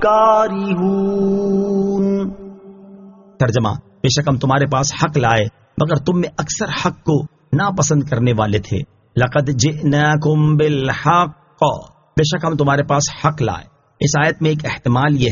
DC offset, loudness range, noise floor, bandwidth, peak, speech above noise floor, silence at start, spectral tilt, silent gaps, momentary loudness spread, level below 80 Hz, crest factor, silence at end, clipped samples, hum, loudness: under 0.1%; 3 LU; -41 dBFS; 7.4 kHz; 0 dBFS; 25 dB; 0 s; -5.5 dB/octave; none; 7 LU; -44 dBFS; 16 dB; 0 s; under 0.1%; none; -17 LUFS